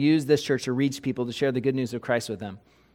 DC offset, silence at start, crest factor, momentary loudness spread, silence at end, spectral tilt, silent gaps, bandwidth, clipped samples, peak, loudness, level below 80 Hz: under 0.1%; 0 s; 18 dB; 10 LU; 0.35 s; -6 dB/octave; none; 16 kHz; under 0.1%; -8 dBFS; -26 LUFS; -64 dBFS